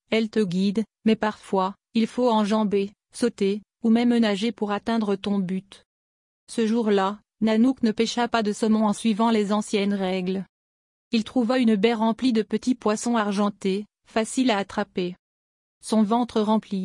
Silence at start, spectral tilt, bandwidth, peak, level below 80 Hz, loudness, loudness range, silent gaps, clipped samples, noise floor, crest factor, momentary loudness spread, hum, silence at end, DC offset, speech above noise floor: 0.1 s; -5.5 dB/octave; 11 kHz; -8 dBFS; -64 dBFS; -24 LUFS; 3 LU; 5.85-6.47 s, 10.49-11.11 s, 15.19-15.81 s; under 0.1%; under -90 dBFS; 16 dB; 7 LU; none; 0 s; under 0.1%; over 67 dB